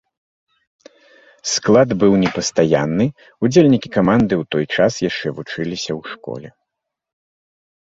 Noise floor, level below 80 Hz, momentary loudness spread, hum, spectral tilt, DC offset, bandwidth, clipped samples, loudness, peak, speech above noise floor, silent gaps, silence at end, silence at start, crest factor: -80 dBFS; -50 dBFS; 13 LU; none; -5.5 dB/octave; under 0.1%; 8 kHz; under 0.1%; -17 LUFS; -2 dBFS; 64 dB; none; 1.45 s; 1.45 s; 18 dB